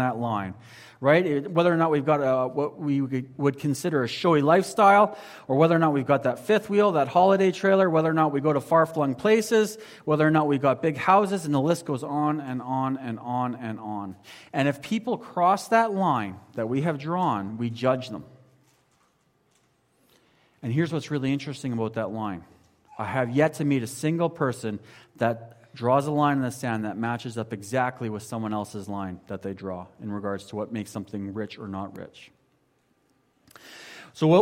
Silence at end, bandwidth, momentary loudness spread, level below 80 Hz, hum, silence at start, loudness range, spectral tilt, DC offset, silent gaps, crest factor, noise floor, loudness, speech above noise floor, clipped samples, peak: 0 s; 16.5 kHz; 14 LU; -68 dBFS; none; 0 s; 12 LU; -6.5 dB/octave; under 0.1%; none; 18 dB; -68 dBFS; -25 LUFS; 43 dB; under 0.1%; -6 dBFS